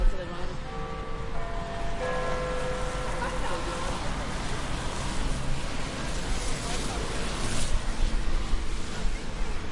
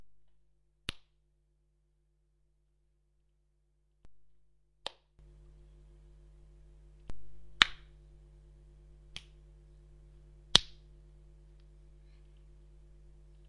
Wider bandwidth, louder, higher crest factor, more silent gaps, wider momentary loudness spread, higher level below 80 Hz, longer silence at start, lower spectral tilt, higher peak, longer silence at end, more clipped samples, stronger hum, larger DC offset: about the same, 11.5 kHz vs 11 kHz; second, -33 LUFS vs -30 LUFS; second, 16 dB vs 42 dB; neither; second, 5 LU vs 29 LU; first, -30 dBFS vs -56 dBFS; about the same, 0 s vs 0 s; first, -4 dB/octave vs -1 dB/octave; second, -12 dBFS vs 0 dBFS; second, 0 s vs 2.75 s; neither; neither; neither